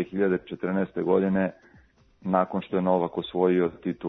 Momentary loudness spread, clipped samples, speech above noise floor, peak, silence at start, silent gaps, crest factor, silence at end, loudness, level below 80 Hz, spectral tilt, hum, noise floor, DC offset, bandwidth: 6 LU; under 0.1%; 32 dB; -8 dBFS; 0 s; none; 18 dB; 0 s; -26 LUFS; -62 dBFS; -10 dB/octave; none; -58 dBFS; under 0.1%; 4.1 kHz